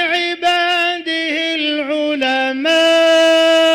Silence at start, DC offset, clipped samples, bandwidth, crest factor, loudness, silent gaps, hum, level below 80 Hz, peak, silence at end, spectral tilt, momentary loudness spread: 0 s; under 0.1%; under 0.1%; 15.5 kHz; 8 dB; -14 LUFS; none; none; -60 dBFS; -6 dBFS; 0 s; -1 dB/octave; 7 LU